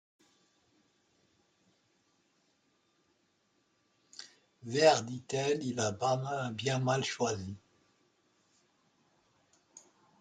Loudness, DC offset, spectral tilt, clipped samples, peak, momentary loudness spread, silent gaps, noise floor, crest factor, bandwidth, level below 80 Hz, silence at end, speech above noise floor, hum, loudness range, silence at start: -32 LUFS; under 0.1%; -4.5 dB/octave; under 0.1%; -10 dBFS; 24 LU; none; -75 dBFS; 26 dB; 9.4 kHz; -78 dBFS; 0.4 s; 43 dB; none; 7 LU; 4.2 s